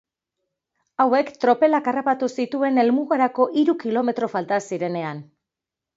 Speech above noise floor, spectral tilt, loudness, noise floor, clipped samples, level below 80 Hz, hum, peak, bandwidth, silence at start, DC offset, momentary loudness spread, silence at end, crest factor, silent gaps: 66 dB; -6 dB/octave; -21 LUFS; -87 dBFS; under 0.1%; -74 dBFS; none; -4 dBFS; 7.8 kHz; 1 s; under 0.1%; 8 LU; 0.75 s; 18 dB; none